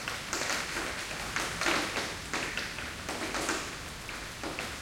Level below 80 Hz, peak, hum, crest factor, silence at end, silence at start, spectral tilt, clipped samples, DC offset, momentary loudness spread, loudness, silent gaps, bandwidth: -52 dBFS; -12 dBFS; none; 22 dB; 0 s; 0 s; -2 dB/octave; under 0.1%; under 0.1%; 9 LU; -33 LUFS; none; 17 kHz